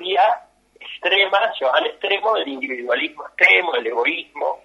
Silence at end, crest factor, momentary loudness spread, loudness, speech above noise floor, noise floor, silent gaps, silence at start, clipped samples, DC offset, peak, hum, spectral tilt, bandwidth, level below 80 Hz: 0.1 s; 20 dB; 13 LU; -18 LUFS; 24 dB; -44 dBFS; none; 0 s; under 0.1%; under 0.1%; 0 dBFS; none; -2 dB/octave; 11.5 kHz; -70 dBFS